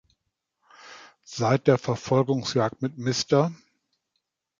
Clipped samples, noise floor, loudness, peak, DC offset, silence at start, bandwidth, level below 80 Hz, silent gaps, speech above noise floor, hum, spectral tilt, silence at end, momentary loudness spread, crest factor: under 0.1%; -80 dBFS; -24 LUFS; -6 dBFS; under 0.1%; 0.85 s; 7.6 kHz; -64 dBFS; none; 56 dB; none; -5.5 dB/octave; 1.05 s; 12 LU; 22 dB